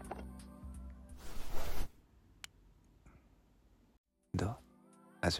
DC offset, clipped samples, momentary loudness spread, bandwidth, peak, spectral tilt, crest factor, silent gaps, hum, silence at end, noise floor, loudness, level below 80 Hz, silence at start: under 0.1%; under 0.1%; 25 LU; 16.5 kHz; -18 dBFS; -5 dB/octave; 20 dB; 3.98-4.04 s; none; 0 s; -67 dBFS; -46 LUFS; -48 dBFS; 0 s